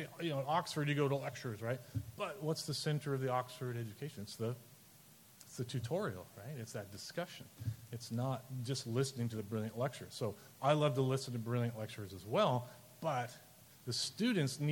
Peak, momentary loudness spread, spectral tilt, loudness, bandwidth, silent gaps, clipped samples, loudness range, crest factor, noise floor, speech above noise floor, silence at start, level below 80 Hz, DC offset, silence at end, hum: -16 dBFS; 13 LU; -5.5 dB/octave; -39 LUFS; 17.5 kHz; none; under 0.1%; 7 LU; 22 dB; -62 dBFS; 24 dB; 0 s; -72 dBFS; under 0.1%; 0 s; none